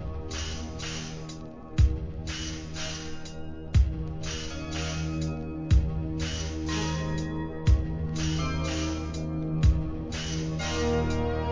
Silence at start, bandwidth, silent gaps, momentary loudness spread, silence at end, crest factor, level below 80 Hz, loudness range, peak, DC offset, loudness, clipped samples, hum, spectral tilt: 0 s; 7.6 kHz; none; 9 LU; 0 s; 18 dB; -32 dBFS; 3 LU; -10 dBFS; 0.2%; -30 LUFS; under 0.1%; none; -5.5 dB/octave